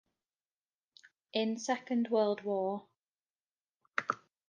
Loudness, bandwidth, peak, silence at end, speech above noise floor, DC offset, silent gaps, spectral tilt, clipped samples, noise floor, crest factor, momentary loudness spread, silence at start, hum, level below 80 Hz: -35 LUFS; 9.6 kHz; -14 dBFS; 0.35 s; over 57 dB; under 0.1%; 3.08-3.12 s, 3.21-3.65 s, 3.76-3.80 s; -4.5 dB/octave; under 0.1%; under -90 dBFS; 24 dB; 8 LU; 1.35 s; none; -88 dBFS